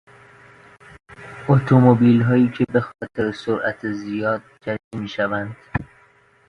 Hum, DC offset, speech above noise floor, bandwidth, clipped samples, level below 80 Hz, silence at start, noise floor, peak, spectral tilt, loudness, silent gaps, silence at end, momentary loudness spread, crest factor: none; under 0.1%; 36 dB; 6.6 kHz; under 0.1%; -50 dBFS; 1.1 s; -55 dBFS; 0 dBFS; -9 dB/octave; -20 LUFS; 4.84-4.91 s; 0.65 s; 16 LU; 20 dB